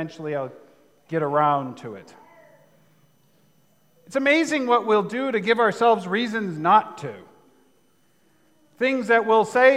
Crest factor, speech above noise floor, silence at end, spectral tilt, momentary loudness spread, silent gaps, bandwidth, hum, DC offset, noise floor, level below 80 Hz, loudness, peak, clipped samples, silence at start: 20 dB; 43 dB; 0 s; -5 dB/octave; 16 LU; none; 12.5 kHz; none; under 0.1%; -64 dBFS; -80 dBFS; -21 LUFS; -4 dBFS; under 0.1%; 0 s